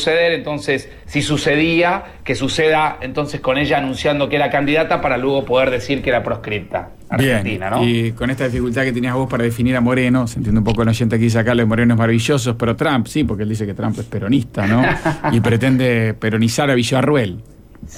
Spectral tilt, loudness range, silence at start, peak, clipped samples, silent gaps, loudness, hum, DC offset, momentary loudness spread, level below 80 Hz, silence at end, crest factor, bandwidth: -6 dB/octave; 2 LU; 0 s; -4 dBFS; under 0.1%; none; -17 LUFS; none; under 0.1%; 7 LU; -38 dBFS; 0 s; 12 dB; 16 kHz